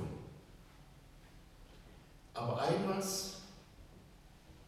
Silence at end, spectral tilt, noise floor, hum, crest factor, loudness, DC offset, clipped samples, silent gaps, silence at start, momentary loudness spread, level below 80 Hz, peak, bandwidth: 0 s; -4.5 dB/octave; -59 dBFS; none; 20 dB; -38 LUFS; under 0.1%; under 0.1%; none; 0 s; 26 LU; -62 dBFS; -22 dBFS; 16.5 kHz